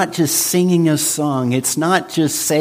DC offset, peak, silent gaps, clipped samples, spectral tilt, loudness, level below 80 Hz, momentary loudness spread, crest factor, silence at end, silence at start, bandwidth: under 0.1%; -2 dBFS; none; under 0.1%; -4 dB/octave; -16 LUFS; -60 dBFS; 3 LU; 14 dB; 0 s; 0 s; 15.5 kHz